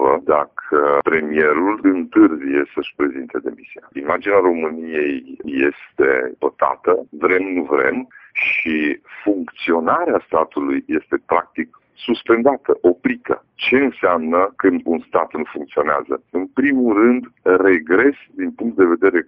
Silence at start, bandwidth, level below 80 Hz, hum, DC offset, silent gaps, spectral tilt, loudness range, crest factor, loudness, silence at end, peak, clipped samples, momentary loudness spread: 0 s; 5.2 kHz; -56 dBFS; none; under 0.1%; none; -8.5 dB/octave; 3 LU; 16 dB; -18 LUFS; 0.05 s; -2 dBFS; under 0.1%; 10 LU